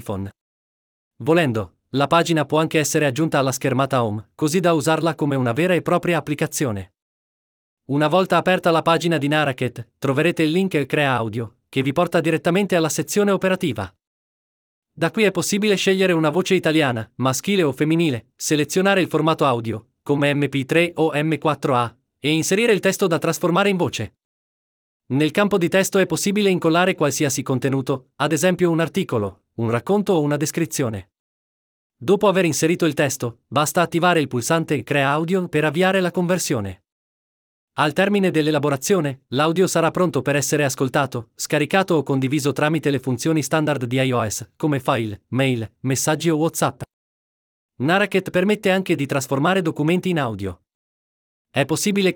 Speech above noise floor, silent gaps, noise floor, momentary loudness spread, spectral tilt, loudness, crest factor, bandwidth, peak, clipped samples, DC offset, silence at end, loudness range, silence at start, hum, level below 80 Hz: over 71 dB; 0.41-1.11 s, 7.02-7.77 s, 14.07-14.82 s, 24.25-25.00 s, 31.19-31.90 s, 36.92-37.68 s, 46.93-47.69 s, 50.75-51.45 s; under -90 dBFS; 8 LU; -5 dB/octave; -20 LUFS; 16 dB; 20 kHz; -4 dBFS; under 0.1%; under 0.1%; 0 s; 2 LU; 0.05 s; none; -62 dBFS